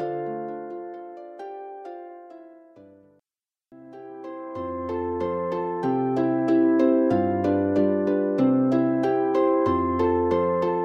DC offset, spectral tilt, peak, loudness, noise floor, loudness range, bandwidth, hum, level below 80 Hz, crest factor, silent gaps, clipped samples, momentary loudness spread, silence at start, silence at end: under 0.1%; -9 dB/octave; -8 dBFS; -23 LUFS; under -90 dBFS; 20 LU; 6.4 kHz; none; -56 dBFS; 16 dB; none; under 0.1%; 19 LU; 0 s; 0 s